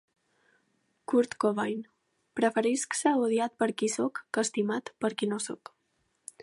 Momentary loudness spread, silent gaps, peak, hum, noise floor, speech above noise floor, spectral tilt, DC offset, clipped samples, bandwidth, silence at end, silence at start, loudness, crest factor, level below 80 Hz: 13 LU; none; -12 dBFS; none; -75 dBFS; 47 dB; -4 dB/octave; under 0.1%; under 0.1%; 11.5 kHz; 0 s; 1.1 s; -29 LUFS; 18 dB; -80 dBFS